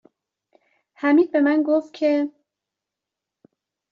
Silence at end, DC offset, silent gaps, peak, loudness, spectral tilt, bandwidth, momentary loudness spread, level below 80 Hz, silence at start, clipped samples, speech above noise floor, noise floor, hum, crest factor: 1.65 s; under 0.1%; none; -8 dBFS; -20 LUFS; -2.5 dB/octave; 6.6 kHz; 7 LU; -74 dBFS; 1 s; under 0.1%; 67 dB; -86 dBFS; none; 16 dB